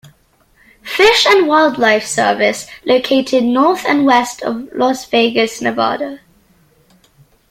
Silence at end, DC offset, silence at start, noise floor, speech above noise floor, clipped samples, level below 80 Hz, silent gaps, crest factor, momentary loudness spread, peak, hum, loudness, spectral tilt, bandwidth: 1.35 s; under 0.1%; 0.85 s; -54 dBFS; 40 dB; under 0.1%; -52 dBFS; none; 14 dB; 12 LU; 0 dBFS; none; -13 LUFS; -3 dB/octave; 16.5 kHz